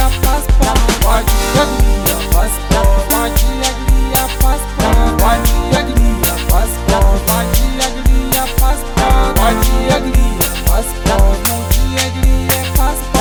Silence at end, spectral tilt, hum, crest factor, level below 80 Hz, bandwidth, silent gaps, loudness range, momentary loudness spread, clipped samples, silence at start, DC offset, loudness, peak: 0 s; -4.5 dB/octave; none; 12 dB; -14 dBFS; over 20 kHz; none; 1 LU; 3 LU; under 0.1%; 0 s; under 0.1%; -14 LUFS; 0 dBFS